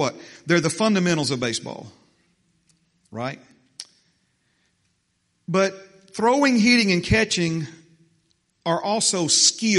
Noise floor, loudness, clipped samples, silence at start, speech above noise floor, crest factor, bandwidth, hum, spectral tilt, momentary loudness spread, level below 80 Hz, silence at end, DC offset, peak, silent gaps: -70 dBFS; -20 LUFS; under 0.1%; 0 s; 49 dB; 20 dB; 11.5 kHz; none; -3.5 dB/octave; 23 LU; -48 dBFS; 0 s; under 0.1%; -4 dBFS; none